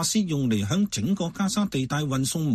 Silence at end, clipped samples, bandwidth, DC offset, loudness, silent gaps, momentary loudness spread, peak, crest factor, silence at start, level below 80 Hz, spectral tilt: 0 s; under 0.1%; 13.5 kHz; under 0.1%; -25 LUFS; none; 2 LU; -12 dBFS; 14 dB; 0 s; -54 dBFS; -5 dB/octave